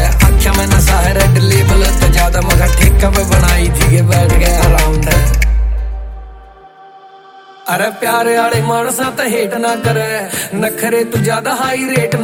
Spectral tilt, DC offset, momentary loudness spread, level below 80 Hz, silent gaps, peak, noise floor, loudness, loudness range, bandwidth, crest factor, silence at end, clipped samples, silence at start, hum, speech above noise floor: -5 dB/octave; under 0.1%; 7 LU; -14 dBFS; none; 0 dBFS; -38 dBFS; -12 LUFS; 7 LU; 17 kHz; 12 dB; 0 s; under 0.1%; 0 s; none; 24 dB